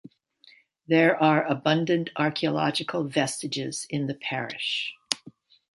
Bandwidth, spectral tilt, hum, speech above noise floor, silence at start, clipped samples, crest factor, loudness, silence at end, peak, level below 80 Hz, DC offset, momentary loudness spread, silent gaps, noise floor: 11.5 kHz; -4.5 dB/octave; none; 33 dB; 0.9 s; under 0.1%; 26 dB; -26 LUFS; 0.45 s; -2 dBFS; -72 dBFS; under 0.1%; 9 LU; none; -58 dBFS